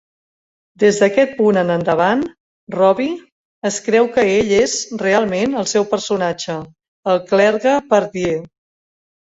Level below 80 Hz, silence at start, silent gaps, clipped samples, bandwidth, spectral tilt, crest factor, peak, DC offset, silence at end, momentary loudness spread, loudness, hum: -54 dBFS; 0.8 s; 2.40-2.67 s, 3.32-3.62 s, 6.88-7.03 s; under 0.1%; 8 kHz; -4.5 dB/octave; 16 dB; -2 dBFS; under 0.1%; 0.9 s; 11 LU; -16 LUFS; none